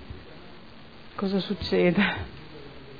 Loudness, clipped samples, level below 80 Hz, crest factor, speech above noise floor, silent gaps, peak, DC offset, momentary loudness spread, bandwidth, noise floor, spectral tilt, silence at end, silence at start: -26 LUFS; under 0.1%; -50 dBFS; 20 dB; 23 dB; none; -10 dBFS; 0.4%; 25 LU; 5 kHz; -48 dBFS; -7.5 dB/octave; 0 s; 0 s